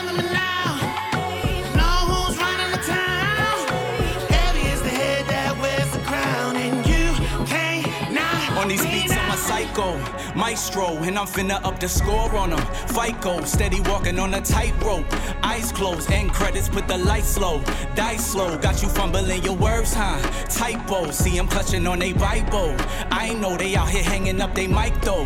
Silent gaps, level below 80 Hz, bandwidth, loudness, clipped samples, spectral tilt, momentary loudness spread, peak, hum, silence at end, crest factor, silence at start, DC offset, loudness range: none; -26 dBFS; 17 kHz; -22 LUFS; under 0.1%; -4 dB/octave; 4 LU; -4 dBFS; none; 0 s; 18 dB; 0 s; under 0.1%; 2 LU